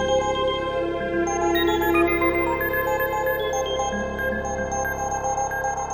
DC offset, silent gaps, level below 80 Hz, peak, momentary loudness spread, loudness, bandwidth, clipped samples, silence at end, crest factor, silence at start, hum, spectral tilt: under 0.1%; none; -40 dBFS; -8 dBFS; 6 LU; -23 LUFS; 18 kHz; under 0.1%; 0 s; 16 dB; 0 s; none; -4 dB/octave